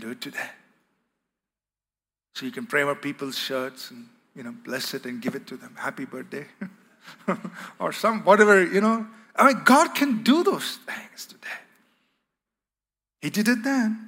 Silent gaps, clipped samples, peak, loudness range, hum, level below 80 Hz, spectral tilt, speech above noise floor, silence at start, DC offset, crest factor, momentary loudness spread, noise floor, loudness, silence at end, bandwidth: none; under 0.1%; -2 dBFS; 13 LU; 50 Hz at -75 dBFS; -82 dBFS; -4 dB/octave; over 66 dB; 0 s; under 0.1%; 22 dB; 22 LU; under -90 dBFS; -23 LUFS; 0 s; 16 kHz